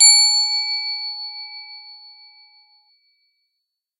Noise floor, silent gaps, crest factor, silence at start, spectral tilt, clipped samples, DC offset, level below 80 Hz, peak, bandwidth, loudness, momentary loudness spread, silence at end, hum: -79 dBFS; none; 22 dB; 0 s; 15 dB/octave; under 0.1%; under 0.1%; under -90 dBFS; 0 dBFS; 15.5 kHz; -16 LUFS; 25 LU; 2.05 s; none